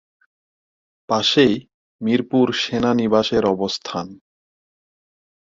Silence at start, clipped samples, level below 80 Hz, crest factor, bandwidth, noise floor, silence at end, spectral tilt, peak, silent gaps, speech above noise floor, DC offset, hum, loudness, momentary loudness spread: 1.1 s; under 0.1%; -56 dBFS; 18 dB; 7.6 kHz; under -90 dBFS; 1.35 s; -5 dB/octave; -2 dBFS; 1.74-1.99 s; over 71 dB; under 0.1%; none; -19 LUFS; 12 LU